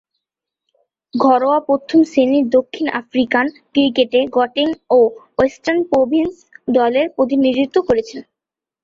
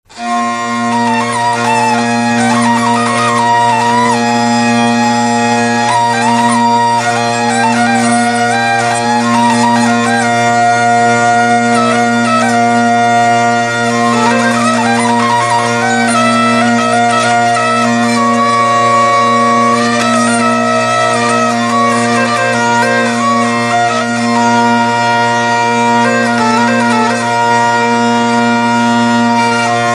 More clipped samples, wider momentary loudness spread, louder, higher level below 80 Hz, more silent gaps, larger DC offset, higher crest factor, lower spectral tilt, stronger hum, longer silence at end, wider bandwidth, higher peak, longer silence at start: neither; first, 6 LU vs 2 LU; second, -16 LUFS vs -10 LUFS; about the same, -52 dBFS vs -56 dBFS; neither; neither; about the same, 14 dB vs 10 dB; first, -5.5 dB/octave vs -4 dB/octave; neither; first, 0.6 s vs 0 s; second, 7.4 kHz vs 12.5 kHz; about the same, -2 dBFS vs 0 dBFS; first, 1.15 s vs 0.1 s